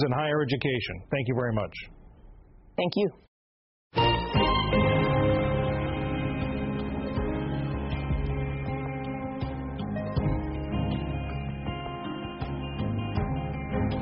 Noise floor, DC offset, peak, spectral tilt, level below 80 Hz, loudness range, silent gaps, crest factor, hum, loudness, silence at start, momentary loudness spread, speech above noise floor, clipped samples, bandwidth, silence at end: -52 dBFS; under 0.1%; -12 dBFS; -5.5 dB/octave; -38 dBFS; 6 LU; 3.28-3.90 s; 16 dB; none; -29 LUFS; 0 s; 10 LU; 24 dB; under 0.1%; 5.8 kHz; 0 s